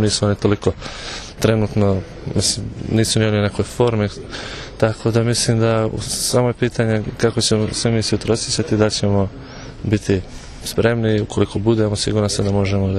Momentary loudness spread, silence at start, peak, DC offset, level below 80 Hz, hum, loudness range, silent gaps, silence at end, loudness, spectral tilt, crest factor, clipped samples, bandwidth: 10 LU; 0 s; -2 dBFS; under 0.1%; -38 dBFS; none; 2 LU; none; 0 s; -18 LUFS; -5 dB/octave; 18 dB; under 0.1%; 13.5 kHz